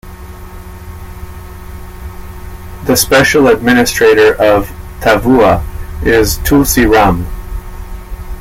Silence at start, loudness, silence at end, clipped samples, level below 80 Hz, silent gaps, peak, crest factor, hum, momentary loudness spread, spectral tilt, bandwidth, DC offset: 0.05 s; -9 LUFS; 0 s; under 0.1%; -24 dBFS; none; 0 dBFS; 12 dB; none; 22 LU; -4.5 dB/octave; 17 kHz; under 0.1%